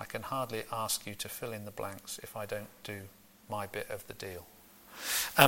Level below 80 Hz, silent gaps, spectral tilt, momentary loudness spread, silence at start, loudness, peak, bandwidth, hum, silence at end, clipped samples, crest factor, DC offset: -66 dBFS; none; -2.5 dB/octave; 15 LU; 0 s; -38 LUFS; -6 dBFS; 17 kHz; none; 0 s; under 0.1%; 30 dB; under 0.1%